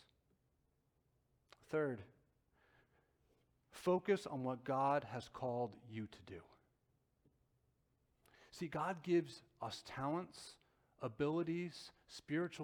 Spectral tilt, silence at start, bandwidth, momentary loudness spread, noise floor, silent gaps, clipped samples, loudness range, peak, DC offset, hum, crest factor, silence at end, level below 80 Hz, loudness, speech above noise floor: -6.5 dB/octave; 1.7 s; 16.5 kHz; 18 LU; -81 dBFS; none; under 0.1%; 9 LU; -24 dBFS; under 0.1%; none; 20 dB; 0 s; -78 dBFS; -42 LUFS; 39 dB